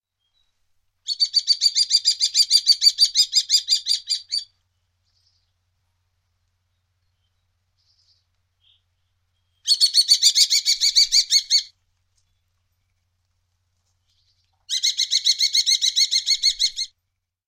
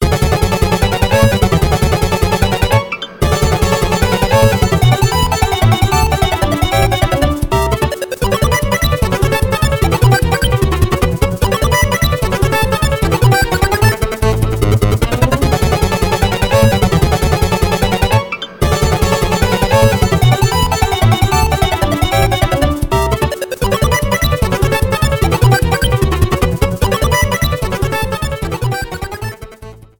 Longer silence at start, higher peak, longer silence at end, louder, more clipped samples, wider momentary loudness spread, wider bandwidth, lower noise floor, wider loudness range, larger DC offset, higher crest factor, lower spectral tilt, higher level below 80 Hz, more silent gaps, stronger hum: first, 1.05 s vs 0 s; about the same, -2 dBFS vs 0 dBFS; first, 0.6 s vs 0.25 s; second, -16 LUFS vs -13 LUFS; neither; first, 10 LU vs 5 LU; second, 16 kHz vs over 20 kHz; first, -78 dBFS vs -34 dBFS; first, 12 LU vs 2 LU; neither; first, 20 dB vs 12 dB; second, 8 dB/octave vs -5 dB/octave; second, -66 dBFS vs -20 dBFS; neither; neither